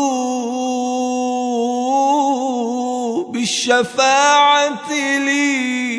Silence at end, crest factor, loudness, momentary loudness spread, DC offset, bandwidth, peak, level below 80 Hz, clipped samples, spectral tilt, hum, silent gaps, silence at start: 0 s; 14 dB; -16 LUFS; 9 LU; under 0.1%; 11 kHz; -2 dBFS; -70 dBFS; under 0.1%; -2 dB/octave; none; none; 0 s